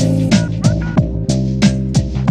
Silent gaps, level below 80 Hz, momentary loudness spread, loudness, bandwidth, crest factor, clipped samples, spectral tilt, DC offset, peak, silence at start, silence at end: none; -26 dBFS; 4 LU; -15 LUFS; 11.5 kHz; 14 dB; under 0.1%; -6.5 dB/octave; under 0.1%; 0 dBFS; 0 s; 0 s